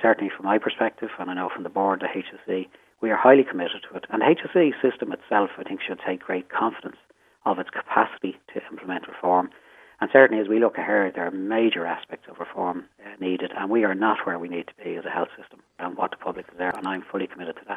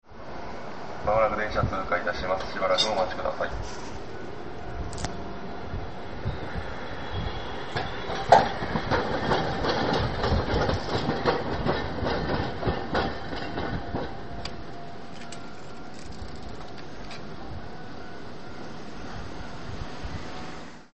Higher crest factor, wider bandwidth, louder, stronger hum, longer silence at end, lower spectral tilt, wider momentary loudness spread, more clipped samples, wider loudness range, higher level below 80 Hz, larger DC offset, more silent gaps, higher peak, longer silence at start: about the same, 24 dB vs 26 dB; about the same, 8.8 kHz vs 8.4 kHz; first, -24 LUFS vs -29 LUFS; neither; about the same, 0 s vs 0 s; first, -7 dB/octave vs -5.5 dB/octave; about the same, 14 LU vs 16 LU; neither; second, 6 LU vs 15 LU; second, -74 dBFS vs -42 dBFS; second, under 0.1% vs 2%; neither; first, 0 dBFS vs -4 dBFS; about the same, 0 s vs 0 s